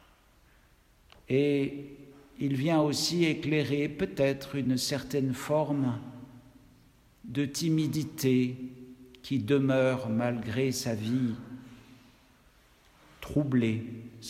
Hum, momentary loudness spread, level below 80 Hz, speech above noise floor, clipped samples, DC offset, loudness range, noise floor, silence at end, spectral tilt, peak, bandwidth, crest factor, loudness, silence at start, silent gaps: none; 17 LU; -60 dBFS; 33 dB; under 0.1%; under 0.1%; 5 LU; -62 dBFS; 0 s; -5.5 dB/octave; -14 dBFS; 16 kHz; 16 dB; -29 LUFS; 1.3 s; none